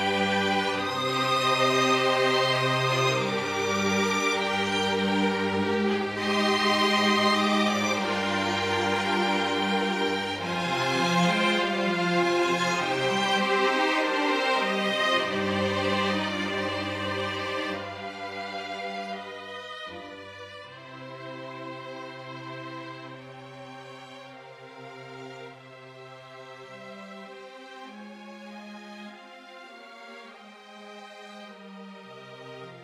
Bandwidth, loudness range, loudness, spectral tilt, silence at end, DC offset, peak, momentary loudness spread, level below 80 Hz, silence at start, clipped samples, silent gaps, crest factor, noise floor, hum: 15.5 kHz; 20 LU; -25 LUFS; -4 dB/octave; 0 s; under 0.1%; -10 dBFS; 22 LU; -68 dBFS; 0 s; under 0.1%; none; 18 dB; -47 dBFS; none